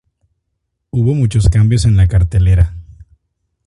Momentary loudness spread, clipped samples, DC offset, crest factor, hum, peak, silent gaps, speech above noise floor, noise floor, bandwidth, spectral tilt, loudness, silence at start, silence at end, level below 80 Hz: 6 LU; under 0.1%; under 0.1%; 14 dB; none; 0 dBFS; none; 61 dB; -71 dBFS; 11 kHz; -7 dB/octave; -13 LUFS; 0.95 s; 0.85 s; -22 dBFS